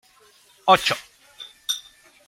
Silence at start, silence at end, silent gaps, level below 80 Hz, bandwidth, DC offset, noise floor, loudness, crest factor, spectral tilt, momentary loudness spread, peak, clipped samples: 0.65 s; 0.45 s; none; -62 dBFS; 16.5 kHz; under 0.1%; -55 dBFS; -22 LUFS; 24 dB; -2 dB/octave; 21 LU; -2 dBFS; under 0.1%